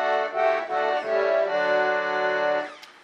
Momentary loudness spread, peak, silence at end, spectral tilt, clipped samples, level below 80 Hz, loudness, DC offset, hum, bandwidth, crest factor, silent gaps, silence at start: 3 LU; -10 dBFS; 0.15 s; -4 dB/octave; under 0.1%; -82 dBFS; -24 LUFS; under 0.1%; none; 8.2 kHz; 14 dB; none; 0 s